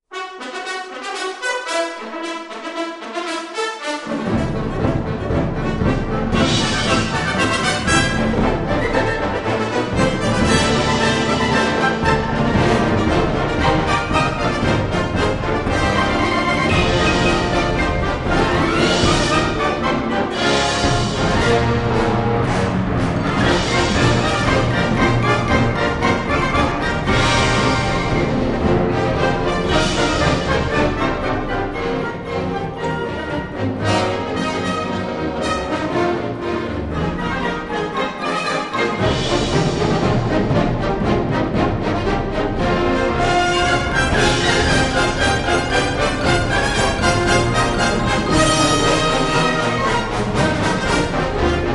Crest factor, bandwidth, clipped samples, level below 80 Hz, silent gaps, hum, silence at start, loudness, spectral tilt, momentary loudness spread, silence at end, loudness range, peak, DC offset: 16 dB; 11.5 kHz; under 0.1%; -30 dBFS; none; none; 0.1 s; -18 LUFS; -5 dB/octave; 7 LU; 0 s; 5 LU; -2 dBFS; under 0.1%